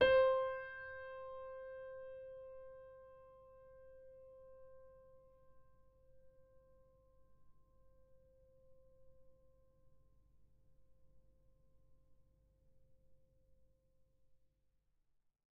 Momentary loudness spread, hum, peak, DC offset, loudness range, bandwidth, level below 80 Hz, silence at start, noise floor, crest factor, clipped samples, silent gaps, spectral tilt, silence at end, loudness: 26 LU; none; -20 dBFS; under 0.1%; 22 LU; 4.9 kHz; -70 dBFS; 0 s; -79 dBFS; 26 dB; under 0.1%; none; -1 dB/octave; 2.45 s; -40 LUFS